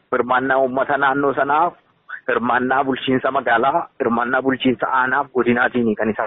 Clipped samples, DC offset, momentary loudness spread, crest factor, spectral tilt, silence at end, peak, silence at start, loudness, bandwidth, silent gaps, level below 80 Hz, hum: under 0.1%; under 0.1%; 4 LU; 14 dB; -3 dB/octave; 0 s; -4 dBFS; 0.1 s; -18 LUFS; 4 kHz; none; -56 dBFS; none